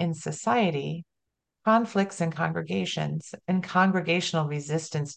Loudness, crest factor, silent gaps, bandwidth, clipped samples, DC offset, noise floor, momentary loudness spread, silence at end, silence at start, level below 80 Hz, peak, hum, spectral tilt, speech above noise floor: -27 LUFS; 18 dB; none; 9.6 kHz; under 0.1%; under 0.1%; -83 dBFS; 9 LU; 0 s; 0 s; -68 dBFS; -8 dBFS; none; -5.5 dB/octave; 57 dB